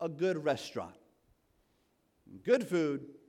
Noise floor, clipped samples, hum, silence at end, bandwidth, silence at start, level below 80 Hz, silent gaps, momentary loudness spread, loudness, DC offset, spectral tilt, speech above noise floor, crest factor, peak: -74 dBFS; under 0.1%; none; 0.1 s; 15 kHz; 0 s; -76 dBFS; none; 13 LU; -33 LUFS; under 0.1%; -6 dB/octave; 41 dB; 20 dB; -14 dBFS